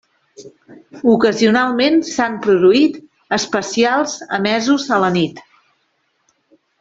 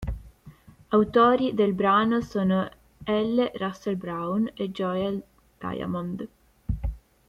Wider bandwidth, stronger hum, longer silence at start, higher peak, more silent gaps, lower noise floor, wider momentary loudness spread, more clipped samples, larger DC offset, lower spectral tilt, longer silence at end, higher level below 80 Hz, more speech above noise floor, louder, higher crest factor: second, 8 kHz vs 11.5 kHz; neither; first, 0.4 s vs 0 s; first, -2 dBFS vs -8 dBFS; neither; first, -65 dBFS vs -51 dBFS; second, 8 LU vs 16 LU; neither; neither; second, -4.5 dB/octave vs -7.5 dB/octave; first, 1.4 s vs 0.3 s; second, -58 dBFS vs -42 dBFS; first, 50 dB vs 26 dB; first, -15 LUFS vs -26 LUFS; about the same, 14 dB vs 18 dB